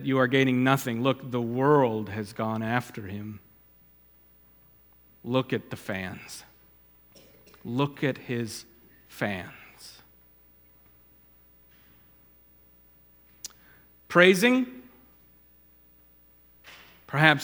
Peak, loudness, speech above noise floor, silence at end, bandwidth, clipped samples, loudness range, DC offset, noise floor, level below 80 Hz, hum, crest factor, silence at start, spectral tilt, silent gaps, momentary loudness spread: -2 dBFS; -26 LUFS; 33 dB; 0 s; 20 kHz; under 0.1%; 14 LU; under 0.1%; -58 dBFS; -66 dBFS; 60 Hz at -60 dBFS; 28 dB; 0 s; -5.5 dB/octave; none; 25 LU